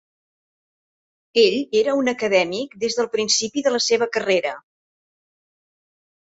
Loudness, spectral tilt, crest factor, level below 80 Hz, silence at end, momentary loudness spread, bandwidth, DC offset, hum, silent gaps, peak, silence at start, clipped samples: -20 LUFS; -2 dB/octave; 20 dB; -68 dBFS; 1.8 s; 7 LU; 8 kHz; under 0.1%; none; none; -4 dBFS; 1.35 s; under 0.1%